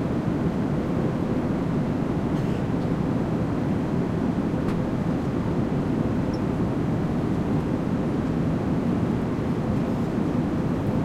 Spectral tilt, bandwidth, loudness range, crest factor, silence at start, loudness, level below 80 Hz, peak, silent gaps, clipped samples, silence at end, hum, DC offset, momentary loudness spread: -8.5 dB/octave; 12.5 kHz; 0 LU; 12 dB; 0 s; -25 LUFS; -40 dBFS; -12 dBFS; none; under 0.1%; 0 s; none; under 0.1%; 1 LU